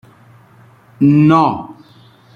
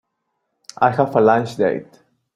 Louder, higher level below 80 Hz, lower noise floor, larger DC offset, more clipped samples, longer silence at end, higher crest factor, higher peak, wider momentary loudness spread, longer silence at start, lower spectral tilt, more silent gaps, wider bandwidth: first, -12 LUFS vs -17 LUFS; first, -54 dBFS vs -62 dBFS; second, -46 dBFS vs -74 dBFS; neither; neither; first, 0.65 s vs 0.5 s; about the same, 14 dB vs 18 dB; about the same, -2 dBFS vs -2 dBFS; first, 18 LU vs 6 LU; first, 1 s vs 0.8 s; first, -9 dB/octave vs -7 dB/octave; neither; second, 6.8 kHz vs 12 kHz